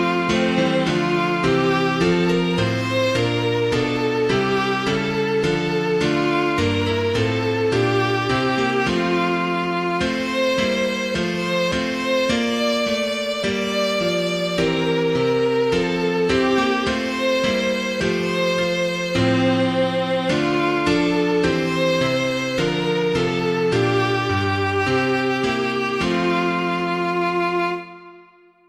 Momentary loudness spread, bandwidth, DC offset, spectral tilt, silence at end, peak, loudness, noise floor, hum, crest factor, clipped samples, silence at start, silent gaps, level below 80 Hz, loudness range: 3 LU; 15 kHz; under 0.1%; -5.5 dB/octave; 0.45 s; -6 dBFS; -20 LUFS; -50 dBFS; none; 14 dB; under 0.1%; 0 s; none; -46 dBFS; 1 LU